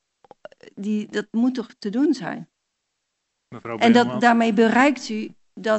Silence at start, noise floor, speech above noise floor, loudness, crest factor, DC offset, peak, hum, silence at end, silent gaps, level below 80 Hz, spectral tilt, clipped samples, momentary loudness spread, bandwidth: 0.75 s; -77 dBFS; 57 dB; -20 LUFS; 20 dB; under 0.1%; -2 dBFS; none; 0 s; none; -70 dBFS; -5.5 dB/octave; under 0.1%; 16 LU; 8.2 kHz